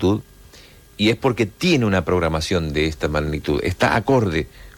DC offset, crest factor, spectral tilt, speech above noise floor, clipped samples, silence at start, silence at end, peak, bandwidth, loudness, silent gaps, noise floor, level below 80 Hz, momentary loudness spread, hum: under 0.1%; 14 dB; -6 dB/octave; 27 dB; under 0.1%; 0 s; 0.05 s; -6 dBFS; 17.5 kHz; -20 LUFS; none; -46 dBFS; -36 dBFS; 5 LU; none